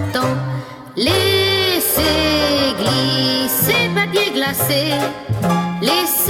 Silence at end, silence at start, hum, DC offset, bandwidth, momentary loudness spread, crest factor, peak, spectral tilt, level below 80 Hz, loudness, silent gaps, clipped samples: 0 s; 0 s; none; under 0.1%; 18 kHz; 7 LU; 14 dB; -2 dBFS; -3.5 dB/octave; -40 dBFS; -16 LUFS; none; under 0.1%